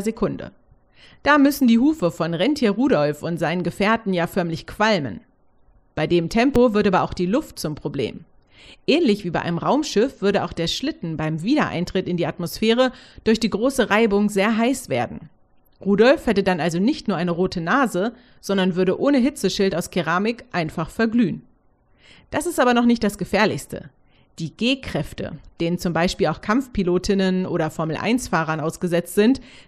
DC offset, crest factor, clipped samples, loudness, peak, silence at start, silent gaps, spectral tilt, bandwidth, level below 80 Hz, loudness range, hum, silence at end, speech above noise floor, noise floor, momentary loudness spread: under 0.1%; 18 dB; under 0.1%; -21 LUFS; -2 dBFS; 0 s; none; -5.5 dB/octave; 13.5 kHz; -46 dBFS; 3 LU; none; 0.05 s; 38 dB; -58 dBFS; 11 LU